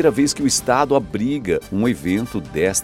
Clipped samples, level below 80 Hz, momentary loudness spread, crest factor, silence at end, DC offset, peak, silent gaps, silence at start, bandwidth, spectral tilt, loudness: under 0.1%; -44 dBFS; 6 LU; 16 dB; 0 s; under 0.1%; -2 dBFS; none; 0 s; 16 kHz; -4 dB/octave; -19 LUFS